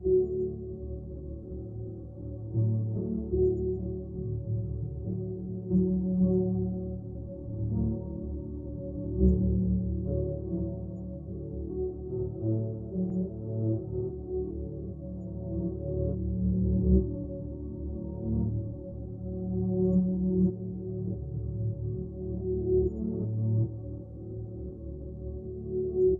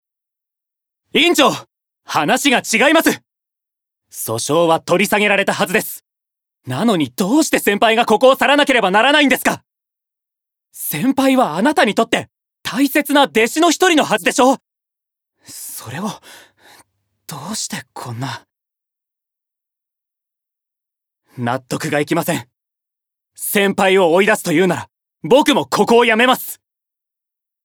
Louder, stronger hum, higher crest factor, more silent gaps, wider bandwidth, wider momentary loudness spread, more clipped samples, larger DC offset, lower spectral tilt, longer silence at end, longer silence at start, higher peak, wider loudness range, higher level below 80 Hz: second, -32 LUFS vs -15 LUFS; neither; about the same, 20 dB vs 16 dB; neither; second, 1.2 kHz vs over 20 kHz; second, 13 LU vs 16 LU; neither; neither; first, -15.5 dB/octave vs -3.5 dB/octave; second, 0 s vs 1.1 s; second, 0 s vs 1.15 s; second, -12 dBFS vs 0 dBFS; second, 3 LU vs 16 LU; first, -40 dBFS vs -60 dBFS